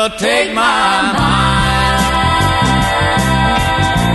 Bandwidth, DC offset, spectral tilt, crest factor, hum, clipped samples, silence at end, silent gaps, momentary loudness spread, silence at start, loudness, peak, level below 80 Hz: 12.5 kHz; under 0.1%; -4.5 dB/octave; 12 dB; none; under 0.1%; 0 s; none; 1 LU; 0 s; -12 LUFS; -2 dBFS; -24 dBFS